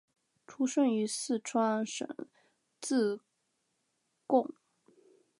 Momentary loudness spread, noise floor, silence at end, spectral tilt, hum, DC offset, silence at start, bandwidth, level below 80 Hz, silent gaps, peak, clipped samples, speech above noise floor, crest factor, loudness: 14 LU; -80 dBFS; 0.9 s; -4 dB/octave; none; under 0.1%; 0.5 s; 11.5 kHz; -90 dBFS; none; -14 dBFS; under 0.1%; 48 dB; 20 dB; -32 LUFS